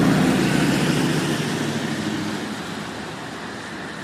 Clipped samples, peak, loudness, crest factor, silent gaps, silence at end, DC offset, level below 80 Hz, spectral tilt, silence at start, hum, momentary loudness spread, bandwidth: under 0.1%; -6 dBFS; -23 LUFS; 16 dB; none; 0 s; under 0.1%; -48 dBFS; -5 dB/octave; 0 s; none; 13 LU; 15.5 kHz